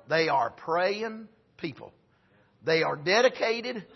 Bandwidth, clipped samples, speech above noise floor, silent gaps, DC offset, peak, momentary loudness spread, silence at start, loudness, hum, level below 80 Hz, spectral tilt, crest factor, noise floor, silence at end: 6.2 kHz; under 0.1%; 37 dB; none; under 0.1%; -10 dBFS; 16 LU; 0.1 s; -27 LUFS; none; -74 dBFS; -4 dB/octave; 18 dB; -64 dBFS; 0.1 s